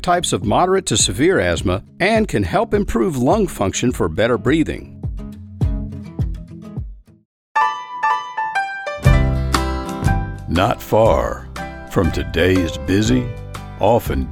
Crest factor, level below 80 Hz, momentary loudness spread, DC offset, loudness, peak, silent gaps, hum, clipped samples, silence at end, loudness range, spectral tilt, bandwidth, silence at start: 18 dB; -28 dBFS; 14 LU; under 0.1%; -18 LUFS; 0 dBFS; 7.25-7.55 s; none; under 0.1%; 0 s; 6 LU; -5 dB/octave; 18 kHz; 0 s